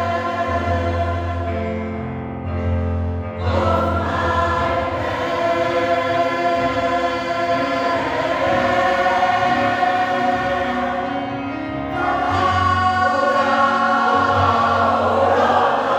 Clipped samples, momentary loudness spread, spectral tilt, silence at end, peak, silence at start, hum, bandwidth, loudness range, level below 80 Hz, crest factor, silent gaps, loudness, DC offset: under 0.1%; 8 LU; -6 dB/octave; 0 s; -4 dBFS; 0 s; none; 13 kHz; 5 LU; -42 dBFS; 16 dB; none; -19 LUFS; under 0.1%